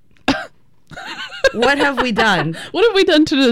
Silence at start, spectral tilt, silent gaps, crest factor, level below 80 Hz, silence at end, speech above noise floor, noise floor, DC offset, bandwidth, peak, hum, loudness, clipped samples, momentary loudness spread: 0.3 s; -4.5 dB/octave; none; 14 dB; -44 dBFS; 0 s; 29 dB; -43 dBFS; under 0.1%; 15.5 kHz; -2 dBFS; none; -15 LUFS; under 0.1%; 16 LU